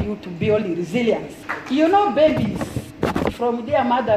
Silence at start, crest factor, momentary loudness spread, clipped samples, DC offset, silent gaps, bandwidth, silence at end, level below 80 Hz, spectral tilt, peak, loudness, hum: 0 s; 16 dB; 11 LU; under 0.1%; under 0.1%; none; 15.5 kHz; 0 s; -44 dBFS; -6.5 dB/octave; -4 dBFS; -20 LUFS; none